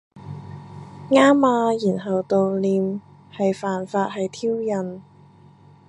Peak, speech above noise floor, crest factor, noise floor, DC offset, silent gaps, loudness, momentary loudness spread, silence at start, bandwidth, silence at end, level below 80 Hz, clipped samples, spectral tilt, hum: -2 dBFS; 29 dB; 20 dB; -49 dBFS; under 0.1%; none; -21 LUFS; 23 LU; 0.15 s; 10.5 kHz; 0.85 s; -62 dBFS; under 0.1%; -6.5 dB/octave; none